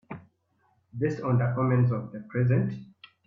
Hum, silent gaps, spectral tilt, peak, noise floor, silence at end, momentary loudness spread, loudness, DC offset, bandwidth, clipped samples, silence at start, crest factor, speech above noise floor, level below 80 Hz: none; none; -10 dB/octave; -12 dBFS; -70 dBFS; 0.4 s; 19 LU; -27 LUFS; under 0.1%; 4.9 kHz; under 0.1%; 0.1 s; 16 dB; 44 dB; -64 dBFS